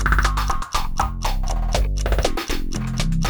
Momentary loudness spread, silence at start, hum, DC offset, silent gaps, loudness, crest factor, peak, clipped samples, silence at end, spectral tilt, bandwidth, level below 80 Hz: 6 LU; 0 s; none; under 0.1%; none; -24 LUFS; 18 dB; -2 dBFS; under 0.1%; 0 s; -4.5 dB/octave; over 20 kHz; -22 dBFS